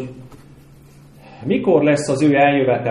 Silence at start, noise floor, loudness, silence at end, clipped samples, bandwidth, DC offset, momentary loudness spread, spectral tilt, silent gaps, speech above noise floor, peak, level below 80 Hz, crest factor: 0 s; -44 dBFS; -16 LUFS; 0 s; under 0.1%; 11.5 kHz; under 0.1%; 13 LU; -6.5 dB/octave; none; 29 dB; -2 dBFS; -54 dBFS; 16 dB